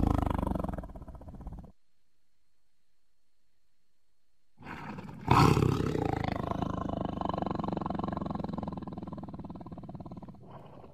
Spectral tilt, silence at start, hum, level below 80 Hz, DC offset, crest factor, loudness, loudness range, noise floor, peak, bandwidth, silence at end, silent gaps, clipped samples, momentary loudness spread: -7 dB/octave; 0 s; none; -44 dBFS; 0.2%; 28 dB; -32 LUFS; 20 LU; -81 dBFS; -6 dBFS; 14.5 kHz; 0 s; none; under 0.1%; 21 LU